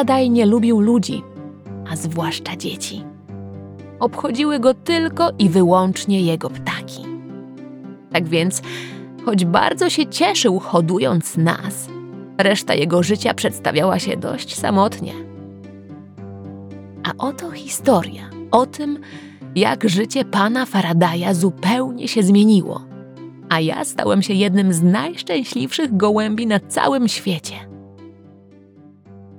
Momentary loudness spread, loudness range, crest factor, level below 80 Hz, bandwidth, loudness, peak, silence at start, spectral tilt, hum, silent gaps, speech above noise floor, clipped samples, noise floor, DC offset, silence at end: 20 LU; 6 LU; 18 dB; -64 dBFS; 17.5 kHz; -18 LUFS; 0 dBFS; 0 s; -5 dB/octave; none; none; 28 dB; under 0.1%; -46 dBFS; under 0.1%; 0 s